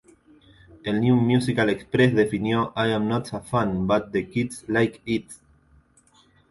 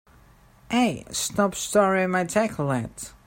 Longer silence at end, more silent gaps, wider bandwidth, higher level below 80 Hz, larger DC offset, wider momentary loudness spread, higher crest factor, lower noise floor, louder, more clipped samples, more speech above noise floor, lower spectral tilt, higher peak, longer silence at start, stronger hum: first, 1.15 s vs 0.15 s; neither; second, 11.5 kHz vs 16.5 kHz; about the same, -52 dBFS vs -54 dBFS; neither; about the same, 8 LU vs 7 LU; about the same, 18 dB vs 18 dB; first, -59 dBFS vs -54 dBFS; about the same, -23 LUFS vs -24 LUFS; neither; first, 36 dB vs 30 dB; first, -6.5 dB/octave vs -4.5 dB/octave; about the same, -6 dBFS vs -6 dBFS; first, 0.85 s vs 0.7 s; neither